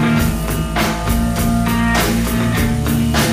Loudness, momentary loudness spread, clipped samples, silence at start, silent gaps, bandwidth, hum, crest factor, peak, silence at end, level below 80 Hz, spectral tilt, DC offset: -17 LUFS; 3 LU; under 0.1%; 0 s; none; 16 kHz; none; 12 dB; -2 dBFS; 0 s; -24 dBFS; -5 dB/octave; under 0.1%